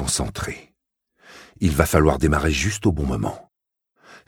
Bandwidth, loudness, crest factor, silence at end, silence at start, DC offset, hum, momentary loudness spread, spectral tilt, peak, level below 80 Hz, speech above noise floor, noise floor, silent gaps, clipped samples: 18 kHz; -21 LUFS; 22 dB; 0.1 s; 0 s; under 0.1%; none; 14 LU; -5 dB/octave; 0 dBFS; -32 dBFS; 58 dB; -78 dBFS; none; under 0.1%